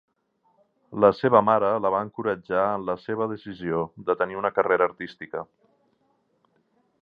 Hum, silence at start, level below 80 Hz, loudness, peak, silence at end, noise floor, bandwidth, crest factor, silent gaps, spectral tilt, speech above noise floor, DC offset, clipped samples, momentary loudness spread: none; 0.9 s; -64 dBFS; -24 LUFS; -2 dBFS; 1.6 s; -69 dBFS; 5.2 kHz; 24 dB; none; -8.5 dB/octave; 45 dB; under 0.1%; under 0.1%; 16 LU